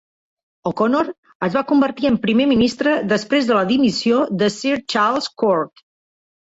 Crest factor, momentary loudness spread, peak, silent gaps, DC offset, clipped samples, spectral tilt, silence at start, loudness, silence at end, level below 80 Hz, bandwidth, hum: 14 dB; 6 LU; -4 dBFS; 1.18-1.23 s, 1.35-1.40 s; under 0.1%; under 0.1%; -5.5 dB/octave; 0.65 s; -18 LUFS; 0.8 s; -54 dBFS; 8 kHz; none